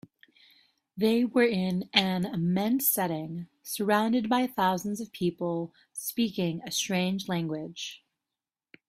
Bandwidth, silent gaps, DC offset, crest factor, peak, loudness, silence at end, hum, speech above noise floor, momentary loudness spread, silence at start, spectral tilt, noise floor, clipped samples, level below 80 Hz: 16 kHz; none; under 0.1%; 24 dB; -6 dBFS; -28 LUFS; 0.9 s; none; over 62 dB; 12 LU; 0.95 s; -4.5 dB/octave; under -90 dBFS; under 0.1%; -68 dBFS